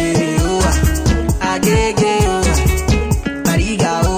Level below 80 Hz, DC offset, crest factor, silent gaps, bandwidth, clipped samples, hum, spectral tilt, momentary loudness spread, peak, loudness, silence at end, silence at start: -20 dBFS; under 0.1%; 12 dB; none; 16 kHz; under 0.1%; none; -5 dB/octave; 3 LU; -2 dBFS; -15 LUFS; 0 s; 0 s